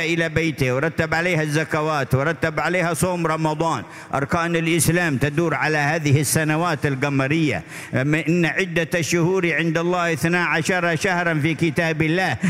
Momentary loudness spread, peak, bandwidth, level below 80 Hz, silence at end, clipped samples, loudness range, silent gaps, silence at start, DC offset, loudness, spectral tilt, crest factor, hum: 3 LU; -4 dBFS; 16 kHz; -48 dBFS; 0 s; under 0.1%; 1 LU; none; 0 s; under 0.1%; -20 LUFS; -5 dB/octave; 16 dB; none